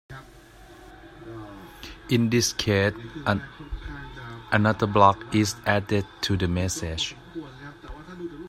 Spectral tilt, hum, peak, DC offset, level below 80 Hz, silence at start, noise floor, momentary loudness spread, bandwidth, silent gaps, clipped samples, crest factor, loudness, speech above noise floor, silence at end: -5 dB/octave; none; -2 dBFS; under 0.1%; -46 dBFS; 0.1 s; -49 dBFS; 21 LU; 15.5 kHz; none; under 0.1%; 24 dB; -24 LUFS; 25 dB; 0 s